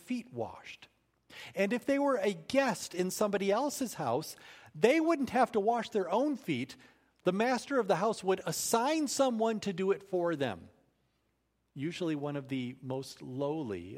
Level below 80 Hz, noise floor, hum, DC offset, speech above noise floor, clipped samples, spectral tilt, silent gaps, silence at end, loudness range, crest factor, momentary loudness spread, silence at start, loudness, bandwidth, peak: -74 dBFS; -78 dBFS; none; under 0.1%; 46 dB; under 0.1%; -4.5 dB/octave; none; 0 s; 6 LU; 22 dB; 13 LU; 0.05 s; -32 LUFS; 16 kHz; -10 dBFS